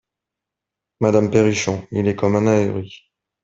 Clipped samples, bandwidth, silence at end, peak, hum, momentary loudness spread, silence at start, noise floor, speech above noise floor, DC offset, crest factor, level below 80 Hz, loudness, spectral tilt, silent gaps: under 0.1%; 7.8 kHz; 0.5 s; -2 dBFS; none; 8 LU; 1 s; -85 dBFS; 67 dB; under 0.1%; 18 dB; -54 dBFS; -18 LUFS; -6 dB/octave; none